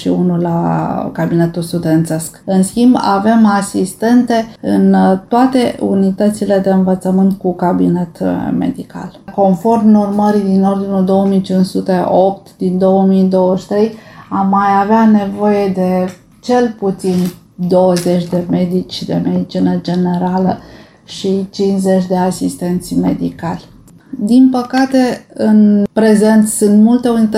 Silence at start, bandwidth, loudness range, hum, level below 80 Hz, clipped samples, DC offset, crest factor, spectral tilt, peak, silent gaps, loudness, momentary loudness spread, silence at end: 0 s; 15 kHz; 4 LU; none; -48 dBFS; under 0.1%; under 0.1%; 12 dB; -7 dB/octave; 0 dBFS; none; -13 LUFS; 9 LU; 0 s